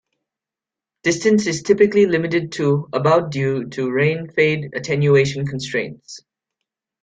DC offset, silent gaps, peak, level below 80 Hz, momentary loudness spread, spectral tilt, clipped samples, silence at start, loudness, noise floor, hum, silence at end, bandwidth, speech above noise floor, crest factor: under 0.1%; none; -2 dBFS; -58 dBFS; 9 LU; -6 dB/octave; under 0.1%; 1.05 s; -18 LUFS; -88 dBFS; none; 0.85 s; 9.2 kHz; 70 dB; 16 dB